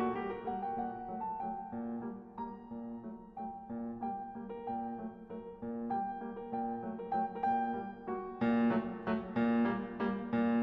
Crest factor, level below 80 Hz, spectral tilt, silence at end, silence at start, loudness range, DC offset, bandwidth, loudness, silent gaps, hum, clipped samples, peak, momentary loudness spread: 14 dB; -64 dBFS; -6 dB/octave; 0 s; 0 s; 9 LU; under 0.1%; 5.2 kHz; -38 LUFS; none; none; under 0.1%; -22 dBFS; 12 LU